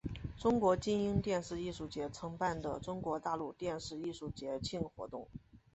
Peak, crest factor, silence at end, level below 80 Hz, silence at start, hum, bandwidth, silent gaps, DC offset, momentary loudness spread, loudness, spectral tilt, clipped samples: -18 dBFS; 20 dB; 0.15 s; -56 dBFS; 0.05 s; none; 8.2 kHz; none; under 0.1%; 13 LU; -38 LUFS; -6 dB/octave; under 0.1%